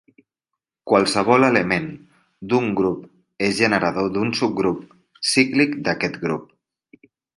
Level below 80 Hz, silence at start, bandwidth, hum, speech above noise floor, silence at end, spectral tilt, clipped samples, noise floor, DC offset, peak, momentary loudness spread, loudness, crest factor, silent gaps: -56 dBFS; 0.85 s; 11.5 kHz; none; 64 dB; 0.95 s; -4.5 dB/octave; under 0.1%; -84 dBFS; under 0.1%; -2 dBFS; 12 LU; -20 LUFS; 20 dB; none